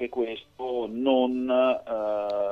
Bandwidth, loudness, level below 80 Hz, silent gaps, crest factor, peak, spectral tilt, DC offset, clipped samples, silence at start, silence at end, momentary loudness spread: 6 kHz; -26 LUFS; -64 dBFS; none; 16 dB; -10 dBFS; -6.5 dB/octave; under 0.1%; under 0.1%; 0 s; 0 s; 9 LU